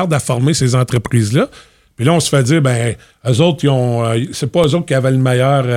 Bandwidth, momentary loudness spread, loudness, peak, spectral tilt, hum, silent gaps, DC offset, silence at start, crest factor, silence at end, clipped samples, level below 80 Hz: 14.5 kHz; 5 LU; -14 LUFS; 0 dBFS; -6 dB/octave; none; none; under 0.1%; 0 s; 14 dB; 0 s; under 0.1%; -46 dBFS